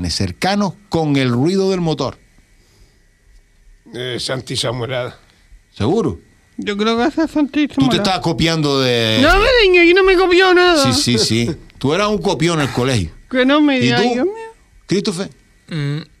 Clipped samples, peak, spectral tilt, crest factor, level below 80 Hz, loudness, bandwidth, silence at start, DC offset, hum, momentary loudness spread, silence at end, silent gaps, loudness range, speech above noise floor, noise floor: under 0.1%; 0 dBFS; -5 dB/octave; 16 dB; -36 dBFS; -15 LUFS; 14 kHz; 0 s; under 0.1%; none; 13 LU; 0.15 s; none; 12 LU; 36 dB; -51 dBFS